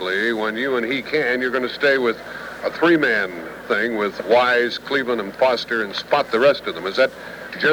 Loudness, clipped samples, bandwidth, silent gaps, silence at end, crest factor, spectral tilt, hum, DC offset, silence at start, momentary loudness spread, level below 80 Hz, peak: -20 LUFS; under 0.1%; over 20 kHz; none; 0 s; 16 dB; -4.5 dB/octave; none; under 0.1%; 0 s; 10 LU; -58 dBFS; -4 dBFS